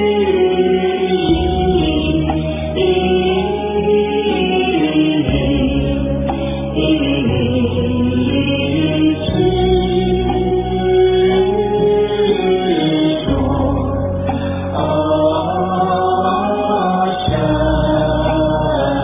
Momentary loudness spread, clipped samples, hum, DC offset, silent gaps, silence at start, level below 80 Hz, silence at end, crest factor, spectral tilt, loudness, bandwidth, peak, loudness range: 4 LU; under 0.1%; none; under 0.1%; none; 0 s; -28 dBFS; 0 s; 12 dB; -11 dB/octave; -15 LUFS; 3.8 kHz; -2 dBFS; 2 LU